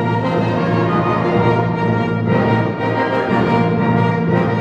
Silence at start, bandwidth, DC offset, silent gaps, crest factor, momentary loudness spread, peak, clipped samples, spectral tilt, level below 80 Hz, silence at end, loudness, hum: 0 s; 7.6 kHz; under 0.1%; none; 12 dB; 2 LU; -2 dBFS; under 0.1%; -8.5 dB/octave; -46 dBFS; 0 s; -16 LUFS; none